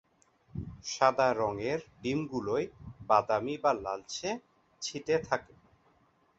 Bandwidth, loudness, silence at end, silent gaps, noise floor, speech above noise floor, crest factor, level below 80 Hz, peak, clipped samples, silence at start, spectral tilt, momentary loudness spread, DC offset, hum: 8.2 kHz; -32 LUFS; 0.95 s; none; -68 dBFS; 37 dB; 22 dB; -60 dBFS; -10 dBFS; under 0.1%; 0.55 s; -4.5 dB/octave; 14 LU; under 0.1%; none